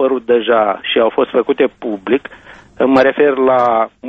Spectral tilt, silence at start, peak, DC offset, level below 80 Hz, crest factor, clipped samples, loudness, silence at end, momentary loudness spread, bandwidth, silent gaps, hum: -6.5 dB/octave; 0 s; 0 dBFS; under 0.1%; -54 dBFS; 14 dB; under 0.1%; -14 LUFS; 0 s; 7 LU; 7.6 kHz; none; none